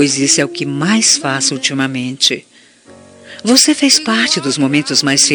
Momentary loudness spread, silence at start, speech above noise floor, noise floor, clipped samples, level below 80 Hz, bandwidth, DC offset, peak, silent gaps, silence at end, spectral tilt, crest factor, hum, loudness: 8 LU; 0 s; 29 dB; -42 dBFS; under 0.1%; -64 dBFS; over 20 kHz; under 0.1%; 0 dBFS; none; 0 s; -2 dB/octave; 14 dB; none; -12 LUFS